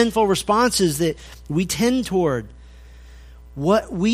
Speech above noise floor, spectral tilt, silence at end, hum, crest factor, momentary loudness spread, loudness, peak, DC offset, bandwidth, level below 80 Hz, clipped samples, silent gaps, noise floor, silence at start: 23 dB; -4.5 dB/octave; 0 s; none; 18 dB; 9 LU; -20 LUFS; -4 dBFS; under 0.1%; 15.5 kHz; -42 dBFS; under 0.1%; none; -42 dBFS; 0 s